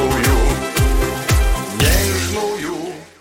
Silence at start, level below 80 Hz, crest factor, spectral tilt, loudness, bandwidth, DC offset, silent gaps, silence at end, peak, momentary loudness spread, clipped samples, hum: 0 s; -20 dBFS; 12 dB; -4.5 dB/octave; -18 LUFS; 17 kHz; under 0.1%; none; 0.15 s; -4 dBFS; 9 LU; under 0.1%; none